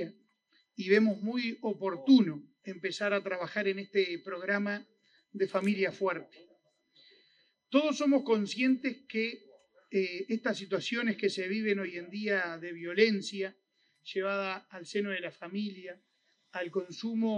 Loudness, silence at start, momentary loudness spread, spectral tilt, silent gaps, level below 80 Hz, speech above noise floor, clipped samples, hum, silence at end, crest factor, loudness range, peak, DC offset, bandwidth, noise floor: -32 LUFS; 0 s; 13 LU; -5.5 dB/octave; none; -88 dBFS; 41 dB; under 0.1%; none; 0 s; 22 dB; 6 LU; -10 dBFS; under 0.1%; 9.8 kHz; -72 dBFS